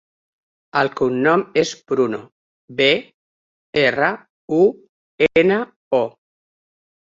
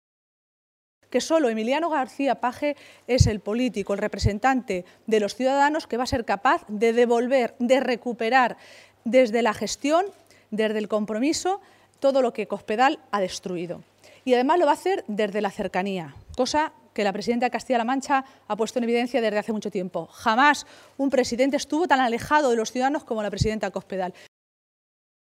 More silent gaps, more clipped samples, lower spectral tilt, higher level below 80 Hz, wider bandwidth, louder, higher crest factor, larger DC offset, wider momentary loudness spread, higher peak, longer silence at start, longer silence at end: first, 2.32-2.68 s, 3.14-3.73 s, 4.30-4.48 s, 4.89-5.18 s, 5.76-5.91 s vs none; neither; about the same, -5 dB/octave vs -5 dB/octave; second, -60 dBFS vs -46 dBFS; second, 7.6 kHz vs 15.5 kHz; first, -19 LUFS vs -24 LUFS; about the same, 18 dB vs 20 dB; neither; about the same, 8 LU vs 10 LU; about the same, -2 dBFS vs -4 dBFS; second, 0.75 s vs 1.1 s; second, 0.9 s vs 1.15 s